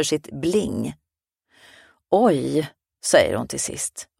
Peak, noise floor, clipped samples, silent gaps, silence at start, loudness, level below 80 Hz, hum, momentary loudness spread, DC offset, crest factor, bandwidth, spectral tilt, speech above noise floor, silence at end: -2 dBFS; -75 dBFS; under 0.1%; none; 0 s; -22 LUFS; -54 dBFS; none; 11 LU; under 0.1%; 22 dB; 16 kHz; -4 dB/octave; 53 dB; 0.15 s